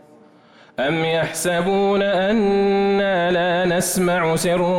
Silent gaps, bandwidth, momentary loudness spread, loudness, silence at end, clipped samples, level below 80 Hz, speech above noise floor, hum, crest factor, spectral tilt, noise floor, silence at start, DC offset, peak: none; 16.5 kHz; 3 LU; -19 LUFS; 0 s; under 0.1%; -50 dBFS; 31 dB; none; 8 dB; -4.5 dB/octave; -49 dBFS; 0.8 s; under 0.1%; -10 dBFS